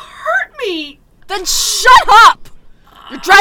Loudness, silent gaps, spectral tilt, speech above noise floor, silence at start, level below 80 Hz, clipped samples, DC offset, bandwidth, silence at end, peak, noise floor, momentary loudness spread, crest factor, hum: -9 LUFS; none; 0 dB/octave; 31 dB; 0.2 s; -36 dBFS; 4%; under 0.1%; over 20 kHz; 0 s; 0 dBFS; -39 dBFS; 19 LU; 12 dB; none